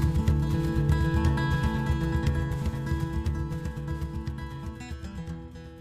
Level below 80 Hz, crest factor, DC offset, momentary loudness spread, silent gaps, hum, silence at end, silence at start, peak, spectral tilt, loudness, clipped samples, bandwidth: -32 dBFS; 16 dB; under 0.1%; 13 LU; none; none; 0 s; 0 s; -12 dBFS; -7.5 dB/octave; -29 LUFS; under 0.1%; 14.5 kHz